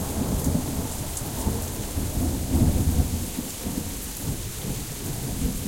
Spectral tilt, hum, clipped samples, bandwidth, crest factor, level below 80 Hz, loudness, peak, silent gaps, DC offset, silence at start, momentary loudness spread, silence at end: -5 dB/octave; none; under 0.1%; 17 kHz; 18 dB; -32 dBFS; -28 LUFS; -8 dBFS; none; under 0.1%; 0 s; 8 LU; 0 s